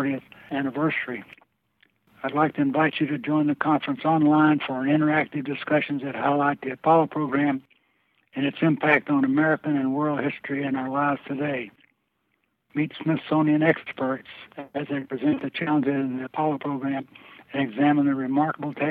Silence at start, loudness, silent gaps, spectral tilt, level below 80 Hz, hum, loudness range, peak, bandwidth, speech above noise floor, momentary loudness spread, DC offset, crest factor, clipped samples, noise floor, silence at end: 0 s; -24 LUFS; none; -9.5 dB/octave; -72 dBFS; none; 5 LU; -6 dBFS; 4.4 kHz; 50 dB; 12 LU; under 0.1%; 20 dB; under 0.1%; -73 dBFS; 0 s